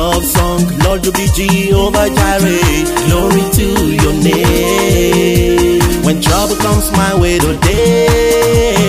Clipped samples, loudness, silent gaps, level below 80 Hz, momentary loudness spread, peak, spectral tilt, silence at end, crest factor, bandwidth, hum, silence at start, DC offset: under 0.1%; -11 LUFS; none; -20 dBFS; 2 LU; 0 dBFS; -5 dB/octave; 0 s; 10 dB; 16 kHz; none; 0 s; under 0.1%